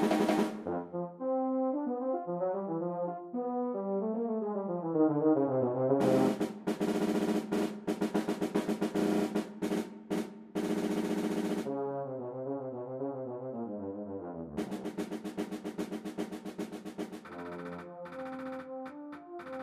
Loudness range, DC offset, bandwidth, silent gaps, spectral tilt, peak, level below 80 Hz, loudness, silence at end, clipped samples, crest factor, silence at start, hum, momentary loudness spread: 10 LU; under 0.1%; 15.5 kHz; none; -6.5 dB/octave; -16 dBFS; -72 dBFS; -34 LUFS; 0 s; under 0.1%; 18 dB; 0 s; none; 13 LU